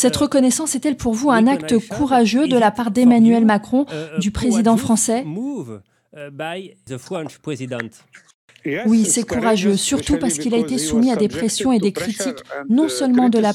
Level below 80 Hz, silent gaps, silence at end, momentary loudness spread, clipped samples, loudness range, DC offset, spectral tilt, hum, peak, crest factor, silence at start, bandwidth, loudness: -44 dBFS; 8.34-8.48 s; 0 s; 14 LU; under 0.1%; 9 LU; under 0.1%; -4.5 dB/octave; none; -2 dBFS; 16 dB; 0 s; 14.5 kHz; -17 LUFS